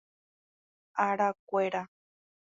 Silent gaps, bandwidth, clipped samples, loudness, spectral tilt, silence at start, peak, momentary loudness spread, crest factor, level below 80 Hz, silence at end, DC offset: 1.39-1.47 s; 7.6 kHz; under 0.1%; -31 LUFS; -6 dB/octave; 0.95 s; -12 dBFS; 10 LU; 22 dB; -82 dBFS; 0.7 s; under 0.1%